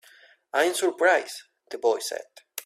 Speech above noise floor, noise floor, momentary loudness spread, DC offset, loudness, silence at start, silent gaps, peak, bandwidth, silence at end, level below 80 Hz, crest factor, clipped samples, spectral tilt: 31 dB; -56 dBFS; 17 LU; under 0.1%; -25 LUFS; 0.55 s; none; -8 dBFS; 16 kHz; 0 s; -76 dBFS; 20 dB; under 0.1%; -0.5 dB/octave